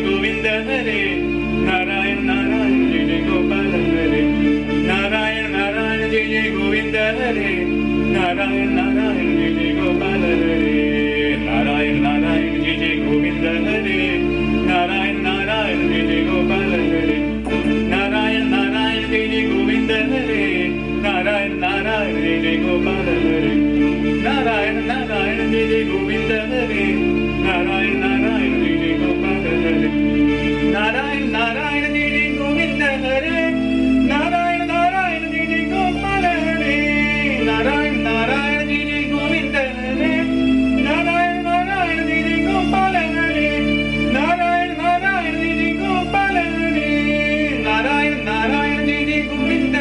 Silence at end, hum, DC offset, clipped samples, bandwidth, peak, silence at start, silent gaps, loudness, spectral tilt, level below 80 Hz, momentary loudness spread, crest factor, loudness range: 0 s; none; under 0.1%; under 0.1%; 10.5 kHz; -6 dBFS; 0 s; none; -17 LUFS; -6 dB/octave; -34 dBFS; 2 LU; 12 dB; 1 LU